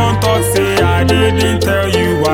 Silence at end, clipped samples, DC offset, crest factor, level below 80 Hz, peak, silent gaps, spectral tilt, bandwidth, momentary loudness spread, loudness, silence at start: 0 s; under 0.1%; under 0.1%; 12 dB; -28 dBFS; 0 dBFS; none; -5 dB/octave; 17 kHz; 2 LU; -12 LUFS; 0 s